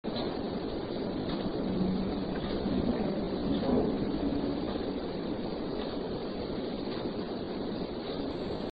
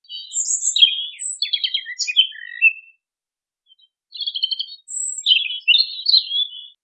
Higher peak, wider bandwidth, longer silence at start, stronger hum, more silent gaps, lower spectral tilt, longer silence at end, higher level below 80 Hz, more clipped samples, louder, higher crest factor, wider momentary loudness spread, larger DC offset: second, -16 dBFS vs 0 dBFS; second, 5.2 kHz vs 10.5 kHz; about the same, 0.05 s vs 0.1 s; neither; neither; first, -6 dB/octave vs 14.5 dB/octave; second, 0 s vs 0.15 s; first, -48 dBFS vs under -90 dBFS; neither; second, -34 LUFS vs -17 LUFS; about the same, 18 dB vs 20 dB; second, 5 LU vs 12 LU; first, 0.2% vs under 0.1%